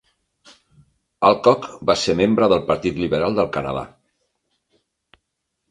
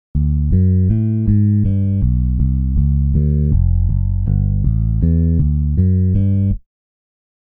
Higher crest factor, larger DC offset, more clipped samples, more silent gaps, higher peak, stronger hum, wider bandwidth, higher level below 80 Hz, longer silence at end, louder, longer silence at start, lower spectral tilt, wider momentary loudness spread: first, 20 dB vs 10 dB; neither; neither; neither; first, 0 dBFS vs -4 dBFS; neither; first, 10.5 kHz vs 1.9 kHz; second, -50 dBFS vs -20 dBFS; first, 1.85 s vs 1 s; second, -19 LUFS vs -16 LUFS; first, 1.2 s vs 0.15 s; second, -5.5 dB/octave vs -14.5 dB/octave; first, 10 LU vs 3 LU